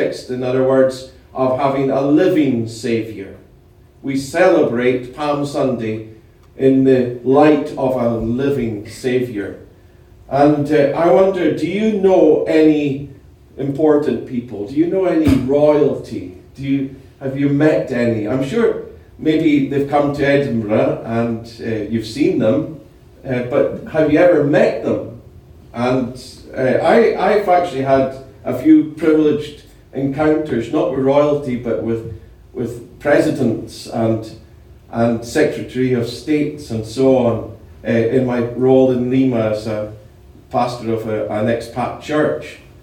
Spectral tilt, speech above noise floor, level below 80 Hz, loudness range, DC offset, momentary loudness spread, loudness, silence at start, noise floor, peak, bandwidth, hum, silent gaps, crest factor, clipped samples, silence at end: -7 dB/octave; 31 dB; -46 dBFS; 4 LU; under 0.1%; 14 LU; -16 LUFS; 0 s; -46 dBFS; 0 dBFS; 15 kHz; none; none; 16 dB; under 0.1%; 0.25 s